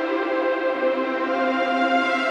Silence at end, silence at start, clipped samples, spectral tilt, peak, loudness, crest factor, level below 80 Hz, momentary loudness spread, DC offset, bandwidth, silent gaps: 0 s; 0 s; under 0.1%; -3.5 dB/octave; -8 dBFS; -22 LUFS; 12 dB; -72 dBFS; 3 LU; under 0.1%; 9 kHz; none